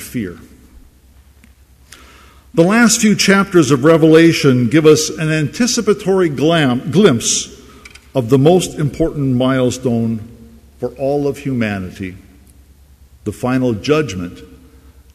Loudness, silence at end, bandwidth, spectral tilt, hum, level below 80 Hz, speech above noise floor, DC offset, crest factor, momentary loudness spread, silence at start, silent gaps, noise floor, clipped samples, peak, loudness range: -13 LUFS; 0.7 s; 15 kHz; -5 dB/octave; none; -42 dBFS; 33 dB; under 0.1%; 14 dB; 16 LU; 0 s; none; -46 dBFS; under 0.1%; 0 dBFS; 10 LU